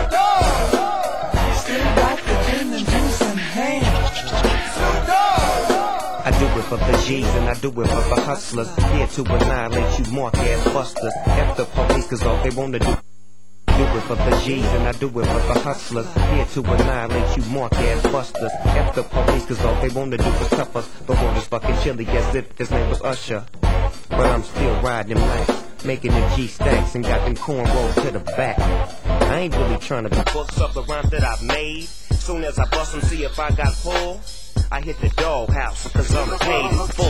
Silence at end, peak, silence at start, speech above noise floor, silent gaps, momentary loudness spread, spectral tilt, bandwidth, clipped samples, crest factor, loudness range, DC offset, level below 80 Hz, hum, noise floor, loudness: 0 s; -2 dBFS; 0 s; 35 dB; none; 5 LU; -5.5 dB/octave; 16 kHz; under 0.1%; 18 dB; 3 LU; 3%; -22 dBFS; none; -54 dBFS; -21 LUFS